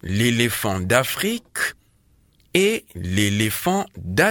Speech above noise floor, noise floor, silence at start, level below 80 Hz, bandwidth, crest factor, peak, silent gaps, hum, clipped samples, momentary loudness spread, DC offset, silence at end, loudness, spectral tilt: 38 dB; -59 dBFS; 0.05 s; -50 dBFS; 19.5 kHz; 22 dB; 0 dBFS; none; none; under 0.1%; 6 LU; under 0.1%; 0 s; -21 LUFS; -4 dB/octave